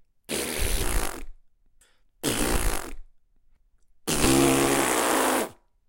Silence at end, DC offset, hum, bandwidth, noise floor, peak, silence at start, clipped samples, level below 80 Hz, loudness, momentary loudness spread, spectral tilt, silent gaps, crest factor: 0.35 s; under 0.1%; none; 17 kHz; -60 dBFS; -8 dBFS; 0.3 s; under 0.1%; -34 dBFS; -25 LUFS; 15 LU; -3 dB/octave; none; 18 dB